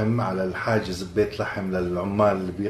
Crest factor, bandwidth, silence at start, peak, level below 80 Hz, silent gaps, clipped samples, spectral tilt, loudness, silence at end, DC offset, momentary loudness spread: 18 dB; 14 kHz; 0 s; -6 dBFS; -46 dBFS; none; under 0.1%; -7 dB/octave; -25 LUFS; 0 s; under 0.1%; 5 LU